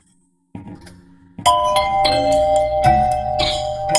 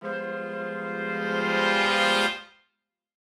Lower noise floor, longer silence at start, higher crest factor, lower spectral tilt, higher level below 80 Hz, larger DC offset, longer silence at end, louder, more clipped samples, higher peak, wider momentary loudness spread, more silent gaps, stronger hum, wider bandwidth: second, -60 dBFS vs -79 dBFS; first, 0.55 s vs 0 s; about the same, 18 dB vs 18 dB; about the same, -3.5 dB/octave vs -3.5 dB/octave; first, -36 dBFS vs -68 dBFS; neither; second, 0 s vs 0.9 s; first, -17 LUFS vs -25 LUFS; neither; first, 0 dBFS vs -8 dBFS; second, 5 LU vs 11 LU; neither; neither; second, 12 kHz vs 16 kHz